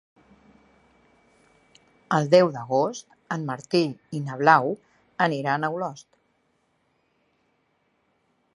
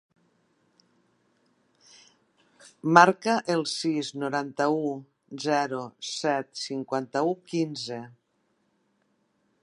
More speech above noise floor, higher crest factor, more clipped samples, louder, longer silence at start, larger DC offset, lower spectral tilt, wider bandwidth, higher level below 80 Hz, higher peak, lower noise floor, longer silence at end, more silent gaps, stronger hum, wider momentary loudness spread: about the same, 47 dB vs 46 dB; about the same, 24 dB vs 28 dB; neither; about the same, -24 LUFS vs -26 LUFS; second, 2.1 s vs 2.65 s; neither; first, -6 dB/octave vs -4.5 dB/octave; about the same, 11 kHz vs 11 kHz; about the same, -74 dBFS vs -78 dBFS; about the same, -2 dBFS vs 0 dBFS; about the same, -70 dBFS vs -72 dBFS; first, 2.55 s vs 1.55 s; neither; neither; about the same, 15 LU vs 15 LU